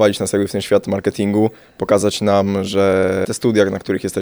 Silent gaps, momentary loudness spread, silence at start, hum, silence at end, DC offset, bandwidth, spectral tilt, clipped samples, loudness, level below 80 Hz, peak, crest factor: none; 5 LU; 0 s; none; 0 s; under 0.1%; over 20 kHz; -5.5 dB/octave; under 0.1%; -17 LUFS; -52 dBFS; -2 dBFS; 16 dB